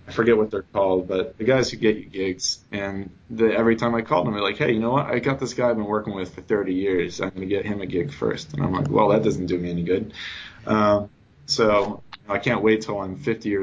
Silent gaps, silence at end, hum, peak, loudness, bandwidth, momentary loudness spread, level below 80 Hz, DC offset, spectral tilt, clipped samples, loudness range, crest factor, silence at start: none; 0 s; none; -6 dBFS; -23 LUFS; 7.8 kHz; 10 LU; -48 dBFS; under 0.1%; -5.5 dB/octave; under 0.1%; 2 LU; 16 dB; 0.05 s